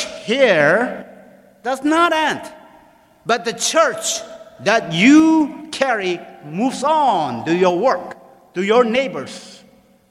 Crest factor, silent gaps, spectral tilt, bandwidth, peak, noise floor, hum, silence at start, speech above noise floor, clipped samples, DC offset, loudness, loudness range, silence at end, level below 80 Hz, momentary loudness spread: 18 dB; none; -4 dB/octave; 14 kHz; 0 dBFS; -50 dBFS; none; 0 s; 33 dB; under 0.1%; under 0.1%; -17 LUFS; 3 LU; 0.55 s; -62 dBFS; 17 LU